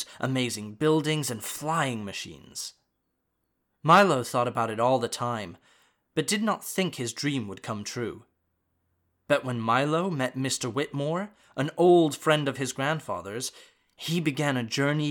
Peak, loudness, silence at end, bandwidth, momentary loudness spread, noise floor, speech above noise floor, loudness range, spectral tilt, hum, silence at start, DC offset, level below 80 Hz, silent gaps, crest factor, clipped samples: -8 dBFS; -27 LUFS; 0 s; 19 kHz; 15 LU; -78 dBFS; 51 dB; 6 LU; -4.5 dB/octave; none; 0 s; under 0.1%; -70 dBFS; none; 20 dB; under 0.1%